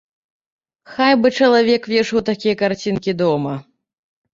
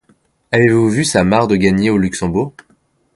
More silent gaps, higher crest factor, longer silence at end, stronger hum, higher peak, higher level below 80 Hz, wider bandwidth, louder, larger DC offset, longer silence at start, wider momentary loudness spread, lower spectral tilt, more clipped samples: neither; about the same, 16 dB vs 14 dB; about the same, 0.7 s vs 0.65 s; neither; about the same, -2 dBFS vs 0 dBFS; second, -56 dBFS vs -40 dBFS; second, 7.6 kHz vs 11.5 kHz; second, -17 LUFS vs -14 LUFS; neither; first, 0.9 s vs 0.5 s; about the same, 9 LU vs 7 LU; about the same, -5.5 dB/octave vs -5.5 dB/octave; neither